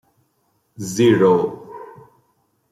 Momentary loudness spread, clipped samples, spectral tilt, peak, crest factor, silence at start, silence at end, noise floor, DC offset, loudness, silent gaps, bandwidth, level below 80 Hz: 23 LU; under 0.1%; -6 dB/octave; -4 dBFS; 18 dB; 0.8 s; 0.8 s; -66 dBFS; under 0.1%; -17 LUFS; none; 15 kHz; -62 dBFS